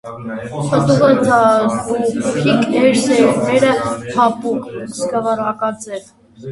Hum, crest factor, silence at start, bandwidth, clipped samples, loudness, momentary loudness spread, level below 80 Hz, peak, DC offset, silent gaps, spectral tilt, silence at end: none; 14 dB; 0.05 s; 11.5 kHz; under 0.1%; -15 LUFS; 15 LU; -50 dBFS; 0 dBFS; under 0.1%; none; -5.5 dB/octave; 0 s